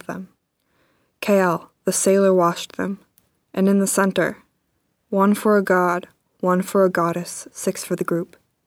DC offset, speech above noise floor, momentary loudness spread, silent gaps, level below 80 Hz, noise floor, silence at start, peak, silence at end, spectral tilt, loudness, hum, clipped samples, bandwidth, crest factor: under 0.1%; 51 dB; 12 LU; none; -68 dBFS; -70 dBFS; 0.1 s; -4 dBFS; 0.4 s; -5 dB/octave; -20 LUFS; none; under 0.1%; 18 kHz; 16 dB